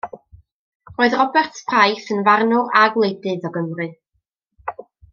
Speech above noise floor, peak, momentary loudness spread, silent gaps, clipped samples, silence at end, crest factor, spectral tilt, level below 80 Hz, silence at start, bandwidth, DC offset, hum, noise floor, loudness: 55 dB; -2 dBFS; 18 LU; 0.52-0.80 s; under 0.1%; 0.3 s; 18 dB; -5 dB/octave; -60 dBFS; 0.05 s; 7.2 kHz; under 0.1%; none; -72 dBFS; -17 LUFS